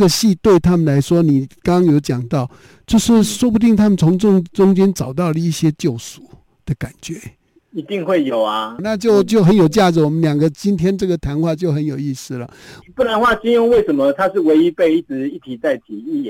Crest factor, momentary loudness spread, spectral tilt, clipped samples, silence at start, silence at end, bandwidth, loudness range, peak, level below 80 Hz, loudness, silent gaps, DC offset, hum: 12 dB; 14 LU; -6.5 dB/octave; under 0.1%; 0 s; 0 s; 17 kHz; 6 LU; -4 dBFS; -42 dBFS; -15 LUFS; none; under 0.1%; none